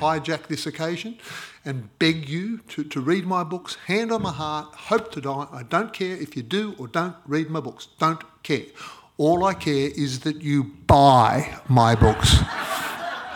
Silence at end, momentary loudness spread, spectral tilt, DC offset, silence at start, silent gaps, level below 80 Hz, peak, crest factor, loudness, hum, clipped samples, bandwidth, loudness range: 0 s; 14 LU; -5.5 dB/octave; under 0.1%; 0 s; none; -38 dBFS; -4 dBFS; 20 dB; -23 LUFS; none; under 0.1%; 18.5 kHz; 8 LU